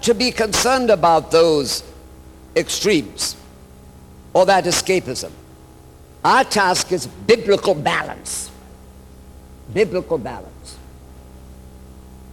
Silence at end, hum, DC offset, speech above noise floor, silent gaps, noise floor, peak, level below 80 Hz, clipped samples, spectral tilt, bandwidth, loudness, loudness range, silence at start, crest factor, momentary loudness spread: 0 s; none; under 0.1%; 26 dB; none; -43 dBFS; -4 dBFS; -44 dBFS; under 0.1%; -3 dB/octave; 18 kHz; -18 LUFS; 9 LU; 0 s; 16 dB; 14 LU